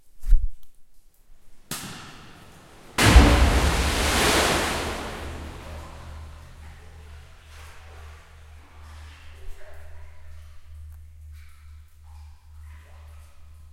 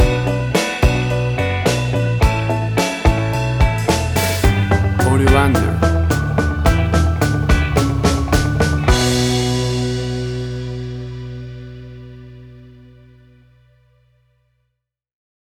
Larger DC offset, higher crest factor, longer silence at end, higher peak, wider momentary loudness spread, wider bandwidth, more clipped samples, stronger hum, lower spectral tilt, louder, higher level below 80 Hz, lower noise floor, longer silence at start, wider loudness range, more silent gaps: neither; first, 24 dB vs 16 dB; second, 0.3 s vs 2.85 s; about the same, 0 dBFS vs 0 dBFS; first, 28 LU vs 14 LU; second, 16.5 kHz vs over 20 kHz; neither; neither; second, -4 dB/octave vs -5.5 dB/octave; second, -22 LUFS vs -17 LUFS; about the same, -28 dBFS vs -24 dBFS; second, -47 dBFS vs -74 dBFS; first, 0.15 s vs 0 s; first, 25 LU vs 13 LU; neither